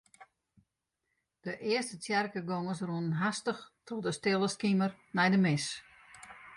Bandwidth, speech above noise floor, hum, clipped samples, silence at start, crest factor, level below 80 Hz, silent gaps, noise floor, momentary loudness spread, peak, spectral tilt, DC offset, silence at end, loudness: 11.5 kHz; 53 dB; none; under 0.1%; 0.2 s; 18 dB; -72 dBFS; none; -84 dBFS; 16 LU; -16 dBFS; -5 dB/octave; under 0.1%; 0 s; -32 LUFS